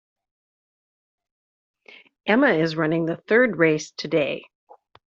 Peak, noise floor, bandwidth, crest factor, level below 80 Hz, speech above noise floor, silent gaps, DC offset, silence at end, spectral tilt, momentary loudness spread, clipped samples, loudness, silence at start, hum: -4 dBFS; under -90 dBFS; 7.8 kHz; 20 dB; -68 dBFS; over 69 dB; none; under 0.1%; 0.75 s; -4.5 dB/octave; 9 LU; under 0.1%; -21 LUFS; 2.25 s; none